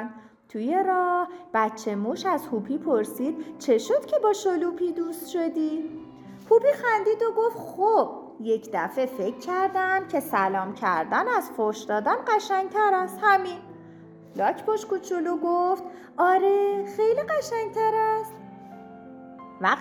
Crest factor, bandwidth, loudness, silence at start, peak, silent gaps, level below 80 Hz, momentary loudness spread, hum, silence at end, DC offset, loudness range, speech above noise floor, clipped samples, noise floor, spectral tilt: 18 dB; 19.5 kHz; -25 LUFS; 0 s; -8 dBFS; none; -72 dBFS; 15 LU; none; 0 s; under 0.1%; 2 LU; 22 dB; under 0.1%; -47 dBFS; -5 dB/octave